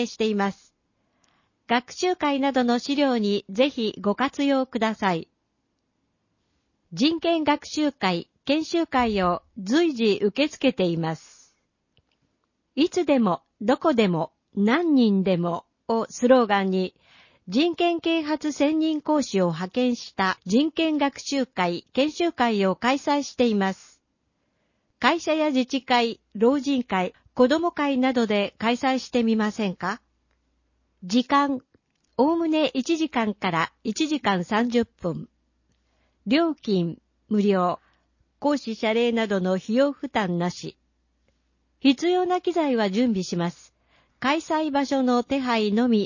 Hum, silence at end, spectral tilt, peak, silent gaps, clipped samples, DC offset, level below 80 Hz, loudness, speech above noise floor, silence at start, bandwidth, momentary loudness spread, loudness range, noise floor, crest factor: none; 0 s; -5.5 dB/octave; -4 dBFS; none; under 0.1%; under 0.1%; -60 dBFS; -24 LUFS; 52 dB; 0 s; 7.4 kHz; 7 LU; 4 LU; -74 dBFS; 20 dB